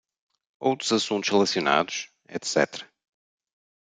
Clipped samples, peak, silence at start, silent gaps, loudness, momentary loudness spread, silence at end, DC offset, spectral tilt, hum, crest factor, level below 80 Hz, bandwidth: under 0.1%; -4 dBFS; 0.6 s; none; -25 LUFS; 11 LU; 1.05 s; under 0.1%; -3 dB/octave; none; 22 dB; -74 dBFS; 9.6 kHz